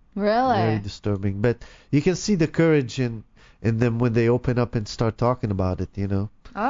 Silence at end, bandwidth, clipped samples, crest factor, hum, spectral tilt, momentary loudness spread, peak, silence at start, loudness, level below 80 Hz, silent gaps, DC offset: 0 s; 7.6 kHz; under 0.1%; 20 dB; none; -7 dB/octave; 8 LU; -2 dBFS; 0.15 s; -23 LUFS; -44 dBFS; none; under 0.1%